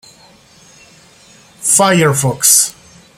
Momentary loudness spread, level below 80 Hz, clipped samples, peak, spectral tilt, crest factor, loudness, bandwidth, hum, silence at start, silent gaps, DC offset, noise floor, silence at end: 8 LU; -54 dBFS; under 0.1%; 0 dBFS; -3 dB/octave; 16 dB; -10 LUFS; over 20 kHz; none; 1.6 s; none; under 0.1%; -45 dBFS; 0.45 s